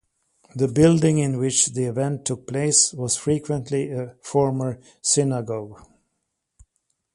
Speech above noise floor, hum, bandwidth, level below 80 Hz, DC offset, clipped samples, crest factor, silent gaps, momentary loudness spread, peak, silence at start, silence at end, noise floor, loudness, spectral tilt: 56 dB; none; 11.5 kHz; -54 dBFS; under 0.1%; under 0.1%; 20 dB; none; 13 LU; -2 dBFS; 0.55 s; 1.4 s; -77 dBFS; -21 LUFS; -4.5 dB/octave